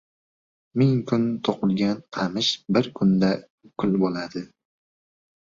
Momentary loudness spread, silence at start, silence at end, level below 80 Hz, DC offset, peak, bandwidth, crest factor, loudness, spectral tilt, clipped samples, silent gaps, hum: 11 LU; 0.75 s; 1.05 s; -60 dBFS; under 0.1%; -6 dBFS; 7.6 kHz; 18 dB; -24 LUFS; -6.5 dB/octave; under 0.1%; 3.50-3.58 s; none